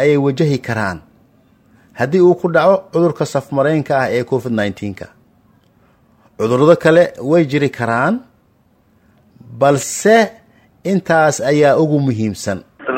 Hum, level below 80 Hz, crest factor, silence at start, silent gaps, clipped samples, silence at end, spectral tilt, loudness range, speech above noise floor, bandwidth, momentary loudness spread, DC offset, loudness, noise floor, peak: none; -54 dBFS; 16 dB; 0 s; none; under 0.1%; 0 s; -6 dB/octave; 3 LU; 41 dB; 16.5 kHz; 11 LU; under 0.1%; -15 LUFS; -55 dBFS; 0 dBFS